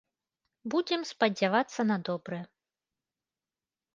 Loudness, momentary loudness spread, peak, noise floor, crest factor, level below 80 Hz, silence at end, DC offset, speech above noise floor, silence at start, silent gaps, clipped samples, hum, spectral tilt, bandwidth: -30 LUFS; 13 LU; -10 dBFS; under -90 dBFS; 22 dB; -80 dBFS; 1.5 s; under 0.1%; over 60 dB; 0.65 s; none; under 0.1%; none; -5 dB/octave; 7.6 kHz